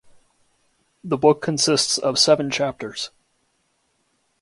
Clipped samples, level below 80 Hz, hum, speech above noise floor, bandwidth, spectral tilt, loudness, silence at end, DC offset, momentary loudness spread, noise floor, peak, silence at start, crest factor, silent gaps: under 0.1%; -62 dBFS; none; 48 dB; 11.5 kHz; -3 dB/octave; -19 LUFS; 1.35 s; under 0.1%; 14 LU; -68 dBFS; -2 dBFS; 1.05 s; 22 dB; none